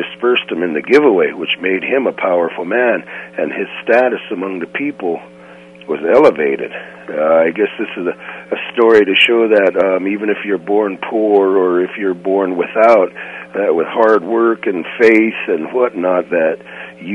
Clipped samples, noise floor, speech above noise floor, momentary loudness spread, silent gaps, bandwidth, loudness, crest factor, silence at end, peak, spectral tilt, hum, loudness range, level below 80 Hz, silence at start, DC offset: under 0.1%; -38 dBFS; 24 dB; 12 LU; none; 8.6 kHz; -14 LUFS; 14 dB; 0 s; 0 dBFS; -6 dB/octave; none; 4 LU; -62 dBFS; 0 s; under 0.1%